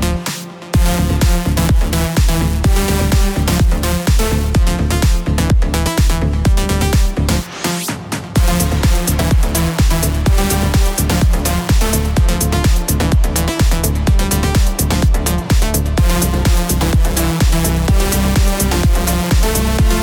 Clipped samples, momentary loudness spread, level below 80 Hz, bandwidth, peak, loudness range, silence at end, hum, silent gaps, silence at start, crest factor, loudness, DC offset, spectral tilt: under 0.1%; 2 LU; -16 dBFS; 19.5 kHz; -2 dBFS; 1 LU; 0 s; none; none; 0 s; 12 dB; -15 LUFS; under 0.1%; -5 dB/octave